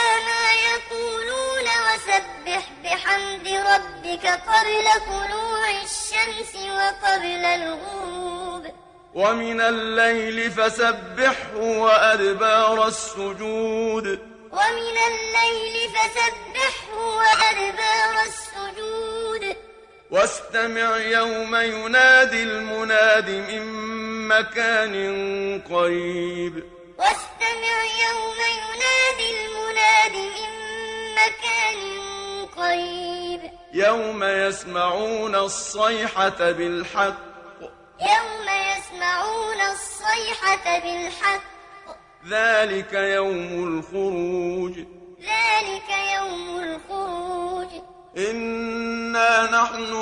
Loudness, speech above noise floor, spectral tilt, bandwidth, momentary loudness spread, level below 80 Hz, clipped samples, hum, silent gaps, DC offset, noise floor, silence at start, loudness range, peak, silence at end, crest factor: -21 LUFS; 25 dB; -2 dB/octave; 11 kHz; 12 LU; -54 dBFS; under 0.1%; none; none; under 0.1%; -47 dBFS; 0 s; 5 LU; -2 dBFS; 0 s; 20 dB